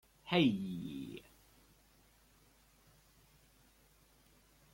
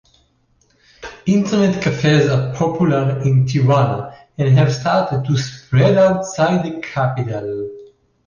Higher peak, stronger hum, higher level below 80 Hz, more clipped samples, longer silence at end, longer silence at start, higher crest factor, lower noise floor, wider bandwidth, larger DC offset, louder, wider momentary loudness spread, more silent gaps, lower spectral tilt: second, -18 dBFS vs -4 dBFS; neither; second, -70 dBFS vs -50 dBFS; neither; first, 3.5 s vs 0.4 s; second, 0.25 s vs 1 s; first, 24 dB vs 14 dB; first, -68 dBFS vs -59 dBFS; first, 16.5 kHz vs 7.2 kHz; neither; second, -36 LUFS vs -17 LUFS; first, 18 LU vs 11 LU; neither; about the same, -6.5 dB/octave vs -7 dB/octave